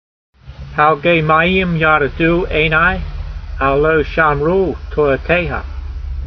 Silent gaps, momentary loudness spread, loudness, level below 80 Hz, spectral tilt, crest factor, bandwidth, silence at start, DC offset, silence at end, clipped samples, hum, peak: none; 14 LU; -14 LUFS; -28 dBFS; -8 dB/octave; 14 dB; 6.2 kHz; 0.45 s; under 0.1%; 0 s; under 0.1%; none; 0 dBFS